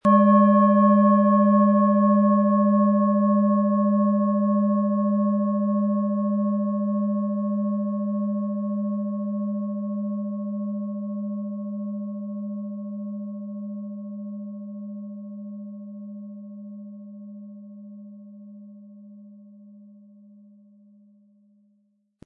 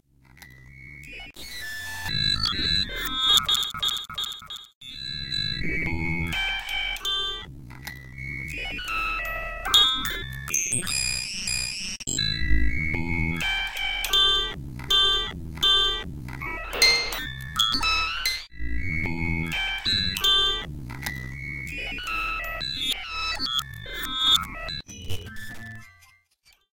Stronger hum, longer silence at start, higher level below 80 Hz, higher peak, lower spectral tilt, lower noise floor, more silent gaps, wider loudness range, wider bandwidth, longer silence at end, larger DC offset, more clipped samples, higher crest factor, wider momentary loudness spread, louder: neither; second, 0.05 s vs 0.4 s; second, -78 dBFS vs -38 dBFS; about the same, -6 dBFS vs -4 dBFS; first, -12 dB/octave vs -1.5 dB/octave; first, -68 dBFS vs -62 dBFS; second, none vs 4.75-4.81 s; first, 22 LU vs 6 LU; second, 3 kHz vs 17 kHz; first, 2.45 s vs 0.85 s; neither; neither; second, 18 dB vs 24 dB; first, 22 LU vs 18 LU; about the same, -22 LUFS vs -24 LUFS